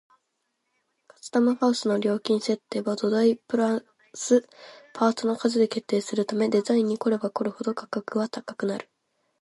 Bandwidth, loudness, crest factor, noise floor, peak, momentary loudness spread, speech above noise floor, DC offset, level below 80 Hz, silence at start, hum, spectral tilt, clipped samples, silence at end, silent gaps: 11.5 kHz; -25 LUFS; 18 dB; -77 dBFS; -8 dBFS; 9 LU; 53 dB; under 0.1%; -76 dBFS; 1.25 s; none; -5 dB/octave; under 0.1%; 0.6 s; none